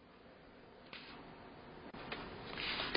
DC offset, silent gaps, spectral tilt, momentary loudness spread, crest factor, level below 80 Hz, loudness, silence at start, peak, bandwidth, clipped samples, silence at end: under 0.1%; none; -1 dB/octave; 19 LU; 32 dB; -64 dBFS; -47 LUFS; 0 s; -14 dBFS; 5.2 kHz; under 0.1%; 0 s